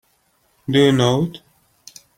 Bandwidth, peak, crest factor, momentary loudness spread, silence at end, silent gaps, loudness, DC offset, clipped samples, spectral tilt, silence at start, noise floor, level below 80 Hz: 16.5 kHz; -2 dBFS; 18 dB; 13 LU; 0.8 s; none; -17 LUFS; under 0.1%; under 0.1%; -6 dB/octave; 0.7 s; -62 dBFS; -56 dBFS